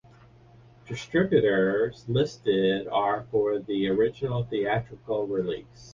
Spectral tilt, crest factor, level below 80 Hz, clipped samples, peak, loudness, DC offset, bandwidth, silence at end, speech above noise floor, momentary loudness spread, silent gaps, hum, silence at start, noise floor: -7 dB/octave; 18 dB; -56 dBFS; under 0.1%; -10 dBFS; -26 LUFS; under 0.1%; 7.4 kHz; 0 s; 28 dB; 8 LU; none; none; 0.85 s; -53 dBFS